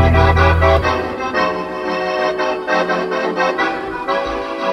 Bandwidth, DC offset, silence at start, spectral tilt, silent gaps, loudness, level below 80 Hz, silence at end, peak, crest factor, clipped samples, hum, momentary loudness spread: 9 kHz; under 0.1%; 0 s; -6.5 dB/octave; none; -17 LUFS; -26 dBFS; 0 s; -2 dBFS; 14 dB; under 0.1%; none; 9 LU